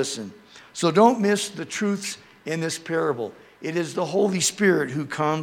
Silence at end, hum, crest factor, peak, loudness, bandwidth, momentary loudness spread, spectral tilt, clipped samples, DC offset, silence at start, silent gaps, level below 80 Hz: 0 s; none; 20 dB; -4 dBFS; -23 LUFS; 18 kHz; 16 LU; -4 dB/octave; under 0.1%; under 0.1%; 0 s; none; -72 dBFS